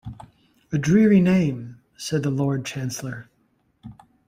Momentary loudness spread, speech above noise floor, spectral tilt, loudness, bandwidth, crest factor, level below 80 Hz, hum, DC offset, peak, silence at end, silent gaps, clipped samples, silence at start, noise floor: 20 LU; 46 dB; -6.5 dB/octave; -21 LUFS; 16 kHz; 16 dB; -54 dBFS; none; under 0.1%; -6 dBFS; 0.35 s; none; under 0.1%; 0.05 s; -66 dBFS